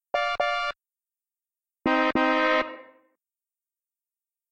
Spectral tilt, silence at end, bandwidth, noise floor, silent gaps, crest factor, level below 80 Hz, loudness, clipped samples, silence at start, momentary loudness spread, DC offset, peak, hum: -4 dB/octave; 1.7 s; 9 kHz; under -90 dBFS; none; 16 dB; -60 dBFS; -25 LUFS; under 0.1%; 0.15 s; 12 LU; under 0.1%; -12 dBFS; none